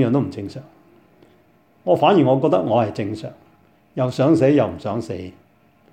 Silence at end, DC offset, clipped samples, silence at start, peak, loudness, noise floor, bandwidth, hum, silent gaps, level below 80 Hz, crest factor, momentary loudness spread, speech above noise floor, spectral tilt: 0.6 s; under 0.1%; under 0.1%; 0 s; -2 dBFS; -19 LUFS; -56 dBFS; 9.4 kHz; none; none; -60 dBFS; 18 dB; 19 LU; 38 dB; -8 dB/octave